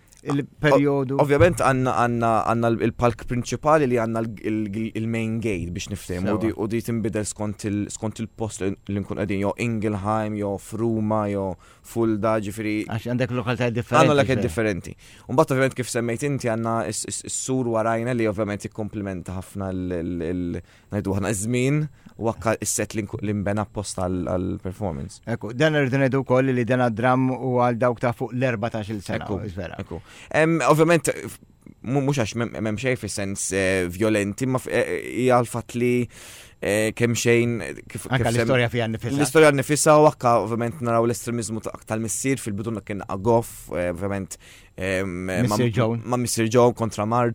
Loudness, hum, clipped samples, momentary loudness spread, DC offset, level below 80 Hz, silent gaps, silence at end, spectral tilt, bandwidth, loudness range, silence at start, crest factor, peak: -23 LUFS; none; under 0.1%; 12 LU; under 0.1%; -50 dBFS; none; 0 s; -5.5 dB/octave; 19 kHz; 7 LU; 0.25 s; 22 dB; -2 dBFS